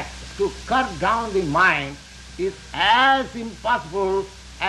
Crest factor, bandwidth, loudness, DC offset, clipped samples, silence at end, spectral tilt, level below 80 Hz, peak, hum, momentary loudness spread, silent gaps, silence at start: 16 dB; 12 kHz; -21 LUFS; under 0.1%; under 0.1%; 0 s; -4 dB/octave; -42 dBFS; -6 dBFS; none; 16 LU; none; 0 s